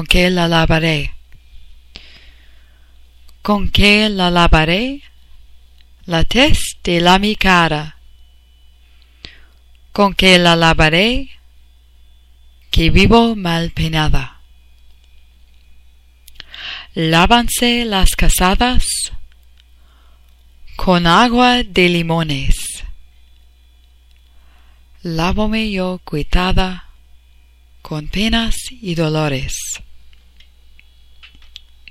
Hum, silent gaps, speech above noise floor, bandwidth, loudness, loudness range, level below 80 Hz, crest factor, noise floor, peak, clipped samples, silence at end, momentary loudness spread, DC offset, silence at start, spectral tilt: none; none; 34 dB; 16 kHz; -14 LUFS; 8 LU; -24 dBFS; 16 dB; -47 dBFS; 0 dBFS; under 0.1%; 0.65 s; 15 LU; under 0.1%; 0 s; -4.5 dB/octave